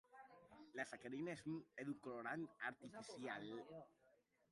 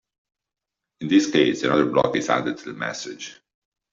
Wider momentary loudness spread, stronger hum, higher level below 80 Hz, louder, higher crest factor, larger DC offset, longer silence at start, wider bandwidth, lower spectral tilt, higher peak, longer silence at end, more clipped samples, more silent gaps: about the same, 16 LU vs 15 LU; neither; second, -88 dBFS vs -62 dBFS; second, -51 LUFS vs -21 LUFS; about the same, 20 dB vs 20 dB; neither; second, 0.1 s vs 1 s; first, 11.5 kHz vs 7.6 kHz; about the same, -5.5 dB/octave vs -4.5 dB/octave; second, -32 dBFS vs -4 dBFS; second, 0.4 s vs 0.6 s; neither; neither